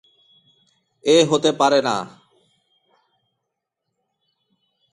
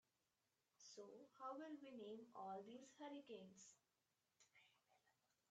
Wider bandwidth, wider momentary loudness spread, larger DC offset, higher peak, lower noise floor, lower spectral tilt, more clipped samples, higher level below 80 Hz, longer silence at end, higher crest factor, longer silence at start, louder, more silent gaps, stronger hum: first, 11 kHz vs 8.4 kHz; first, 12 LU vs 9 LU; neither; first, -2 dBFS vs -42 dBFS; second, -80 dBFS vs under -90 dBFS; about the same, -4 dB/octave vs -4 dB/octave; neither; first, -68 dBFS vs under -90 dBFS; first, 2.85 s vs 0.4 s; about the same, 22 dB vs 18 dB; first, 1.05 s vs 0.8 s; first, -18 LUFS vs -59 LUFS; neither; neither